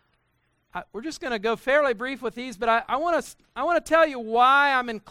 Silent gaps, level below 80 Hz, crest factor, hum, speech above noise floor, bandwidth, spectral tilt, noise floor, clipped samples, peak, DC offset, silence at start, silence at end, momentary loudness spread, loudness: none; -58 dBFS; 18 dB; none; 47 dB; 15 kHz; -3.5 dB/octave; -70 dBFS; under 0.1%; -6 dBFS; under 0.1%; 0.75 s; 0.1 s; 16 LU; -23 LUFS